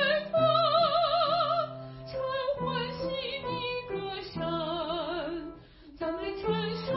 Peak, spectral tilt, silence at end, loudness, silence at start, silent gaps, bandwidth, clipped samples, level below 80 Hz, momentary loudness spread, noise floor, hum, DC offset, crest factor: -14 dBFS; -9 dB/octave; 0 s; -30 LUFS; 0 s; none; 5.8 kHz; under 0.1%; -56 dBFS; 13 LU; -50 dBFS; none; under 0.1%; 16 dB